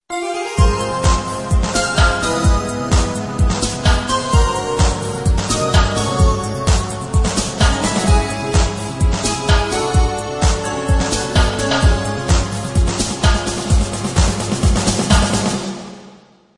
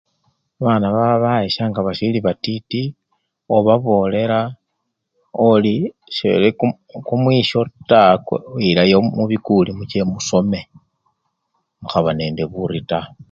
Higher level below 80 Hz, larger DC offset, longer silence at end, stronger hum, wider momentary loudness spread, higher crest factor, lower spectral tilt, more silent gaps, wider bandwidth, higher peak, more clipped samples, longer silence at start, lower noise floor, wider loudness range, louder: first, -20 dBFS vs -50 dBFS; neither; first, 0.4 s vs 0.1 s; neither; second, 5 LU vs 10 LU; about the same, 16 dB vs 18 dB; second, -4.5 dB/octave vs -6.5 dB/octave; neither; first, 11.5 kHz vs 7.6 kHz; about the same, 0 dBFS vs 0 dBFS; neither; second, 0.1 s vs 0.6 s; second, -45 dBFS vs -74 dBFS; second, 1 LU vs 5 LU; about the same, -17 LUFS vs -17 LUFS